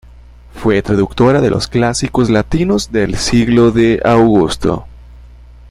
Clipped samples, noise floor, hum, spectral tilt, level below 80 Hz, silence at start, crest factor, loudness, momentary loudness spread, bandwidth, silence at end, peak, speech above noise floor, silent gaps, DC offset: under 0.1%; -38 dBFS; 60 Hz at -30 dBFS; -6 dB/octave; -30 dBFS; 0.55 s; 12 dB; -13 LUFS; 6 LU; 13 kHz; 0.25 s; 0 dBFS; 26 dB; none; under 0.1%